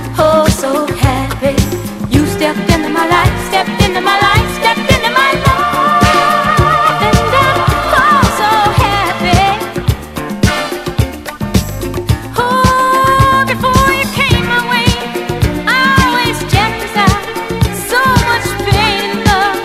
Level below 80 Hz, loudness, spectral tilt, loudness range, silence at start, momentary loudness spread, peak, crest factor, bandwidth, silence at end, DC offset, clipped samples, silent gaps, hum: -24 dBFS; -11 LUFS; -4.5 dB/octave; 4 LU; 0 s; 7 LU; 0 dBFS; 12 dB; 16.5 kHz; 0 s; under 0.1%; 0.2%; none; none